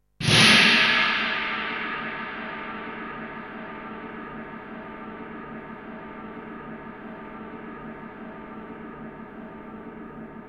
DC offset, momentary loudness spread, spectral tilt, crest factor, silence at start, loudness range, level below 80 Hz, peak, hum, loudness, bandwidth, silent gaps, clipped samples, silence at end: under 0.1%; 24 LU; -3 dB/octave; 22 dB; 0.2 s; 19 LU; -56 dBFS; -4 dBFS; none; -20 LUFS; 14.5 kHz; none; under 0.1%; 0 s